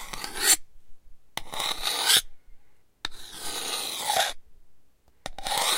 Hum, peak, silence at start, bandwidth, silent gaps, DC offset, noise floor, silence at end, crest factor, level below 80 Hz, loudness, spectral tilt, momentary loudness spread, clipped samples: none; -4 dBFS; 0 s; 16.5 kHz; none; under 0.1%; -53 dBFS; 0 s; 24 dB; -48 dBFS; -25 LUFS; 1 dB/octave; 18 LU; under 0.1%